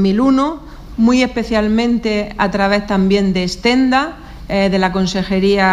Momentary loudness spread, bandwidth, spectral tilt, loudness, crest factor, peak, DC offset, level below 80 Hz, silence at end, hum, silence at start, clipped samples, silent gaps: 7 LU; 11.5 kHz; -6 dB/octave; -15 LUFS; 14 dB; 0 dBFS; under 0.1%; -34 dBFS; 0 s; none; 0 s; under 0.1%; none